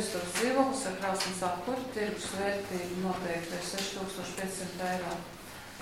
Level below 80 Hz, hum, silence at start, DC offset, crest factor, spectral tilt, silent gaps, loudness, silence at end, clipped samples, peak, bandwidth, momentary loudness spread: -60 dBFS; none; 0 s; under 0.1%; 22 dB; -3.5 dB/octave; none; -33 LUFS; 0 s; under 0.1%; -12 dBFS; 16.5 kHz; 8 LU